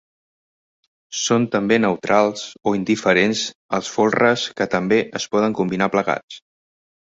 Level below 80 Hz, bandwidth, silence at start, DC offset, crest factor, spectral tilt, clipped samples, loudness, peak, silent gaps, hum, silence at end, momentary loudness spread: -58 dBFS; 8 kHz; 1.1 s; under 0.1%; 18 dB; -4.5 dB/octave; under 0.1%; -19 LUFS; -2 dBFS; 3.55-3.69 s, 6.23-6.28 s; none; 0.8 s; 8 LU